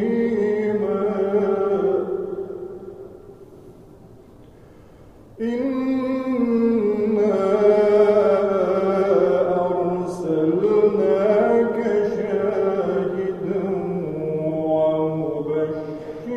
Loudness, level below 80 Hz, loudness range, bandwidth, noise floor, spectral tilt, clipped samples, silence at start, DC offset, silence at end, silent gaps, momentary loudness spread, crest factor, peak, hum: -20 LUFS; -54 dBFS; 11 LU; 7.6 kHz; -46 dBFS; -8.5 dB/octave; under 0.1%; 0 s; under 0.1%; 0 s; none; 10 LU; 16 dB; -6 dBFS; none